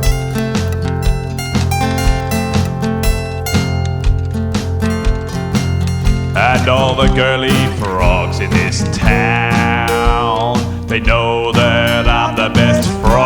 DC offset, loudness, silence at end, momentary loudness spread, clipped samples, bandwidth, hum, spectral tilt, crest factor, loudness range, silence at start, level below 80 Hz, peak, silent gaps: under 0.1%; -14 LUFS; 0 s; 6 LU; under 0.1%; over 20 kHz; none; -5.5 dB/octave; 14 dB; 4 LU; 0 s; -20 dBFS; 0 dBFS; none